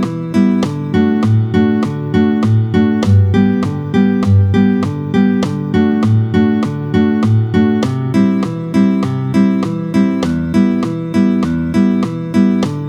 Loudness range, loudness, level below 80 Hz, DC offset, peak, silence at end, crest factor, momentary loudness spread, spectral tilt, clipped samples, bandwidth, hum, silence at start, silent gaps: 2 LU; -14 LUFS; -42 dBFS; under 0.1%; 0 dBFS; 0 s; 12 dB; 5 LU; -8.5 dB/octave; under 0.1%; 10.5 kHz; none; 0 s; none